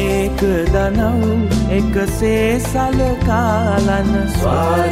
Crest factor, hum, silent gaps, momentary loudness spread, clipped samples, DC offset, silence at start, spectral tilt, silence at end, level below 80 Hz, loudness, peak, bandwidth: 12 dB; none; none; 2 LU; under 0.1%; under 0.1%; 0 s; -6.5 dB/octave; 0 s; -24 dBFS; -16 LUFS; -2 dBFS; 16 kHz